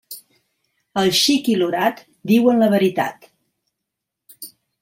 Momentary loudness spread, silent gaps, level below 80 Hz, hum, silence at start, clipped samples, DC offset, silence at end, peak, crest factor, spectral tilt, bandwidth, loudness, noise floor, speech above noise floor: 22 LU; none; -64 dBFS; none; 0.1 s; under 0.1%; under 0.1%; 0.35 s; -4 dBFS; 16 dB; -4 dB/octave; 16.5 kHz; -17 LUFS; -81 dBFS; 65 dB